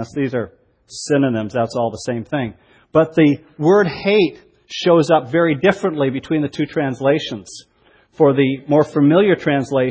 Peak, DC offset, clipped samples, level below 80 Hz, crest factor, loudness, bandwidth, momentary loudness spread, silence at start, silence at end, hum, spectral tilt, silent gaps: 0 dBFS; under 0.1%; under 0.1%; -54 dBFS; 18 dB; -17 LUFS; 8 kHz; 12 LU; 0 s; 0 s; none; -6.5 dB/octave; none